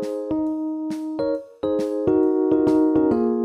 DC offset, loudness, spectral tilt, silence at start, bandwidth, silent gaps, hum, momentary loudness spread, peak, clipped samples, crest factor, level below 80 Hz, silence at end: under 0.1%; -22 LUFS; -8 dB/octave; 0 s; 8.8 kHz; none; none; 9 LU; -8 dBFS; under 0.1%; 14 dB; -54 dBFS; 0 s